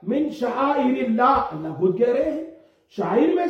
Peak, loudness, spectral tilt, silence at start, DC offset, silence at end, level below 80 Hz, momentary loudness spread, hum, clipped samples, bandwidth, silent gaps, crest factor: -6 dBFS; -21 LUFS; -7.5 dB/octave; 0 s; under 0.1%; 0 s; -54 dBFS; 11 LU; none; under 0.1%; 8 kHz; none; 14 dB